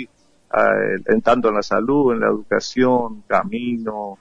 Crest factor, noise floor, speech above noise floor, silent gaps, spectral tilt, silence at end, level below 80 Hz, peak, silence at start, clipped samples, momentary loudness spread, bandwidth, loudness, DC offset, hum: 16 dB; -41 dBFS; 23 dB; none; -6 dB/octave; 0.05 s; -50 dBFS; -4 dBFS; 0 s; under 0.1%; 8 LU; 8.2 kHz; -19 LUFS; under 0.1%; none